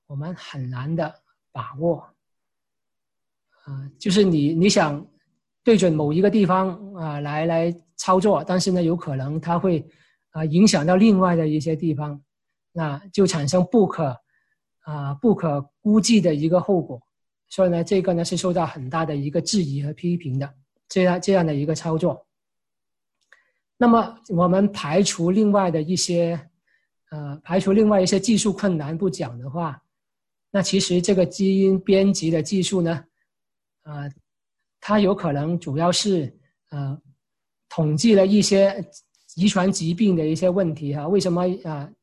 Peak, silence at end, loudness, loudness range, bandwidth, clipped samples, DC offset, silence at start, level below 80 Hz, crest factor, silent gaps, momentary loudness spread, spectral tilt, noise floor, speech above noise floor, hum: -4 dBFS; 0.15 s; -21 LUFS; 4 LU; 12 kHz; under 0.1%; under 0.1%; 0.1 s; -56 dBFS; 16 dB; none; 15 LU; -5.5 dB/octave; -88 dBFS; 68 dB; none